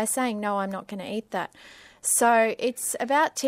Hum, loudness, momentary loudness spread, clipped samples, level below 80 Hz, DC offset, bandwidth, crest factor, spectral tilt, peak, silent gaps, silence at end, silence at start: none; -25 LUFS; 13 LU; under 0.1%; -70 dBFS; under 0.1%; 16 kHz; 18 dB; -2.5 dB/octave; -8 dBFS; none; 0 s; 0 s